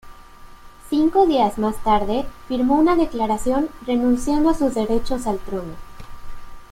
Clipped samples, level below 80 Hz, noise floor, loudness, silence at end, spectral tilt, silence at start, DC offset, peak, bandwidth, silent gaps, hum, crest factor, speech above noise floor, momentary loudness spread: under 0.1%; -36 dBFS; -41 dBFS; -20 LUFS; 0.05 s; -6 dB/octave; 0.05 s; under 0.1%; -6 dBFS; 16 kHz; none; none; 14 dB; 23 dB; 10 LU